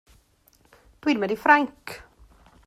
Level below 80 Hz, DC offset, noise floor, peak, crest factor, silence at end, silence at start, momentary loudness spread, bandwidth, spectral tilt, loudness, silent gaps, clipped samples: -58 dBFS; under 0.1%; -61 dBFS; -4 dBFS; 22 dB; 0.7 s; 1.05 s; 21 LU; 15 kHz; -5 dB/octave; -22 LUFS; none; under 0.1%